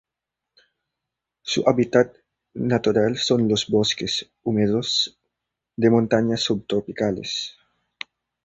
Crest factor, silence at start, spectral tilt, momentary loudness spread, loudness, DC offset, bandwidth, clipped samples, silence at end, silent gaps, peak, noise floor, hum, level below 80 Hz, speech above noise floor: 22 dB; 1.45 s; -5 dB/octave; 17 LU; -22 LUFS; under 0.1%; 8.2 kHz; under 0.1%; 0.95 s; none; -2 dBFS; -85 dBFS; none; -56 dBFS; 64 dB